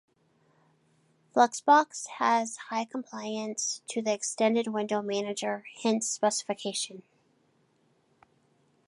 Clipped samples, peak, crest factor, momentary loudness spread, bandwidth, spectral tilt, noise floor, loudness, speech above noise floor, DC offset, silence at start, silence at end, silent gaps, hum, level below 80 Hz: under 0.1%; -8 dBFS; 22 dB; 11 LU; 11.5 kHz; -2.5 dB/octave; -69 dBFS; -29 LUFS; 40 dB; under 0.1%; 1.35 s; 1.85 s; none; none; -84 dBFS